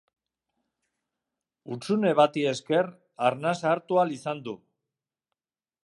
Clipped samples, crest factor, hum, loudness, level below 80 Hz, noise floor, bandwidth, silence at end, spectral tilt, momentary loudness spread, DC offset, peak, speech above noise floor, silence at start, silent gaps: under 0.1%; 22 dB; none; -26 LUFS; -80 dBFS; -89 dBFS; 11.5 kHz; 1.3 s; -5.5 dB/octave; 15 LU; under 0.1%; -6 dBFS; 63 dB; 1.65 s; none